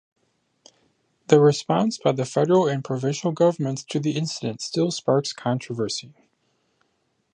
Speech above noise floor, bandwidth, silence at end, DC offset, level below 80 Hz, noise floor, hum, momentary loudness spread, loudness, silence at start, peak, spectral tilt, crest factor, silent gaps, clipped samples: 49 dB; 10 kHz; 1.25 s; under 0.1%; -70 dBFS; -71 dBFS; none; 9 LU; -23 LUFS; 1.3 s; -2 dBFS; -6 dB/octave; 22 dB; none; under 0.1%